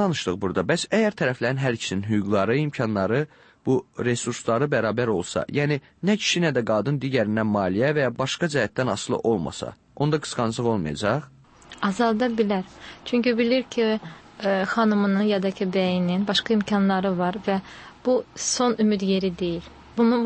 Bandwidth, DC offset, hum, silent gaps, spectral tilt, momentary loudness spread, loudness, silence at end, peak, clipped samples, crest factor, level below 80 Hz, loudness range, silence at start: 8.8 kHz; under 0.1%; none; none; -5 dB/octave; 7 LU; -24 LUFS; 0 s; -8 dBFS; under 0.1%; 16 dB; -56 dBFS; 2 LU; 0 s